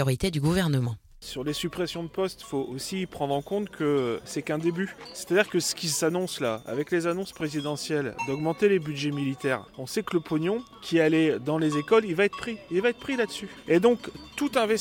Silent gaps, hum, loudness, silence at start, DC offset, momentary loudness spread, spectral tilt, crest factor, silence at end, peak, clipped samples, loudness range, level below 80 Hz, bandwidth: none; none; -27 LUFS; 0 s; under 0.1%; 9 LU; -5 dB/octave; 20 dB; 0 s; -6 dBFS; under 0.1%; 4 LU; -54 dBFS; 17 kHz